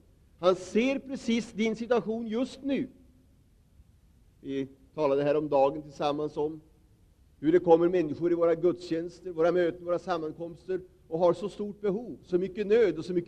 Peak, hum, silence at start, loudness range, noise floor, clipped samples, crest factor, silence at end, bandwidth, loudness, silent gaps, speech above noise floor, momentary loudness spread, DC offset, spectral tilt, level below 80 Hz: -8 dBFS; none; 0.4 s; 6 LU; -61 dBFS; under 0.1%; 20 dB; 0 s; 9.8 kHz; -29 LUFS; none; 34 dB; 12 LU; under 0.1%; -6.5 dB/octave; -62 dBFS